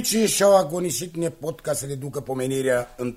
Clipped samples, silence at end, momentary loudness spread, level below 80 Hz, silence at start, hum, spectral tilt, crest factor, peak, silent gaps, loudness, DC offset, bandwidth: under 0.1%; 0 s; 13 LU; -54 dBFS; 0 s; none; -4 dB/octave; 18 dB; -6 dBFS; none; -23 LUFS; under 0.1%; 16 kHz